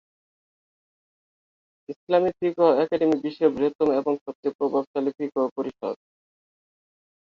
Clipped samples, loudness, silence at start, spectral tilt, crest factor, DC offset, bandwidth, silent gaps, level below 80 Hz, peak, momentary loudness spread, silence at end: under 0.1%; -24 LUFS; 1.9 s; -7.5 dB/octave; 18 dB; under 0.1%; 7 kHz; 1.96-2.07 s, 3.75-3.79 s, 4.21-4.26 s, 4.35-4.43 s, 4.55-4.59 s, 4.87-4.94 s, 5.51-5.56 s; -68 dBFS; -8 dBFS; 12 LU; 1.35 s